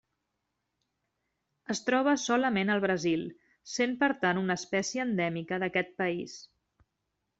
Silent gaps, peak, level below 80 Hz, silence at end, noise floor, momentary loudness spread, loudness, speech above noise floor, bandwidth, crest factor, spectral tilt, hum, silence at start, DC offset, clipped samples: none; -12 dBFS; -72 dBFS; 0.95 s; -83 dBFS; 11 LU; -30 LUFS; 53 dB; 8.2 kHz; 20 dB; -4.5 dB/octave; none; 1.7 s; under 0.1%; under 0.1%